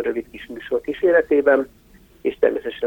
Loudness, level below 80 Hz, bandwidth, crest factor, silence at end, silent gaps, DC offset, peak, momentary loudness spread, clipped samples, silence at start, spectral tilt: -20 LUFS; -52 dBFS; 17 kHz; 18 dB; 0 s; none; under 0.1%; -4 dBFS; 16 LU; under 0.1%; 0 s; -6 dB/octave